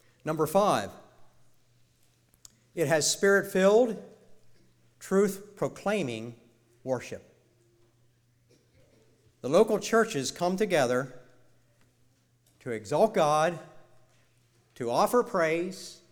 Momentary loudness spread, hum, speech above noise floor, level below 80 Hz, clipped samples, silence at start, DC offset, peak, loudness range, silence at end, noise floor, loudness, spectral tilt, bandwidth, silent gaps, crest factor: 18 LU; none; 40 dB; -66 dBFS; under 0.1%; 0.25 s; under 0.1%; -10 dBFS; 8 LU; 0.15 s; -66 dBFS; -27 LUFS; -4.5 dB/octave; 19.5 kHz; none; 20 dB